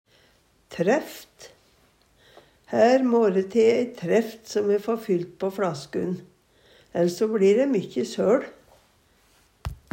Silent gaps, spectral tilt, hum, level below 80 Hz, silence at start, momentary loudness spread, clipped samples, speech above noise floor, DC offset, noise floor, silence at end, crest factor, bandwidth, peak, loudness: none; -6 dB/octave; none; -54 dBFS; 0.7 s; 17 LU; under 0.1%; 39 dB; under 0.1%; -61 dBFS; 0.2 s; 18 dB; 16 kHz; -6 dBFS; -23 LUFS